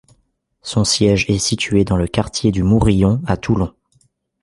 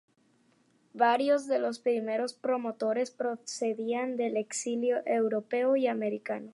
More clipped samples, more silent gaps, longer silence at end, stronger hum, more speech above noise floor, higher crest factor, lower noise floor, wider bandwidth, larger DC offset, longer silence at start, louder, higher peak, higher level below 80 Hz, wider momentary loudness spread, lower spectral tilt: neither; neither; first, 0.75 s vs 0.05 s; neither; first, 48 dB vs 38 dB; about the same, 16 dB vs 20 dB; second, -64 dBFS vs -68 dBFS; about the same, 11.5 kHz vs 11.5 kHz; neither; second, 0.65 s vs 0.95 s; first, -16 LUFS vs -30 LUFS; first, -2 dBFS vs -10 dBFS; first, -32 dBFS vs -86 dBFS; about the same, 6 LU vs 6 LU; about the same, -5 dB/octave vs -4 dB/octave